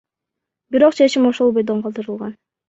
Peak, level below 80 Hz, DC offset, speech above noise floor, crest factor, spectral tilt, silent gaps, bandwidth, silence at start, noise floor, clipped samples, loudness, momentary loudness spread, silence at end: -2 dBFS; -64 dBFS; under 0.1%; 66 dB; 16 dB; -5.5 dB/octave; none; 8 kHz; 0.7 s; -82 dBFS; under 0.1%; -16 LUFS; 15 LU; 0.35 s